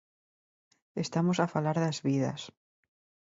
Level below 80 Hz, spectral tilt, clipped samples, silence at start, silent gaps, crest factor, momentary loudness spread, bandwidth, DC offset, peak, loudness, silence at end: -72 dBFS; -6 dB/octave; under 0.1%; 0.95 s; none; 20 dB; 14 LU; 7.8 kHz; under 0.1%; -12 dBFS; -30 LUFS; 0.75 s